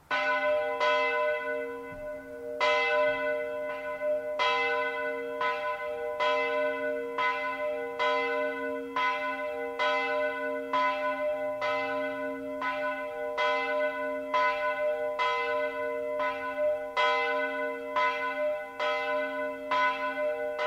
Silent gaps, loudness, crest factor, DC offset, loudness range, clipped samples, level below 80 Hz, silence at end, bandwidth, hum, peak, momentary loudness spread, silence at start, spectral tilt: none; -30 LUFS; 16 dB; under 0.1%; 2 LU; under 0.1%; -68 dBFS; 0 s; 15.5 kHz; none; -14 dBFS; 7 LU; 0.1 s; -3 dB/octave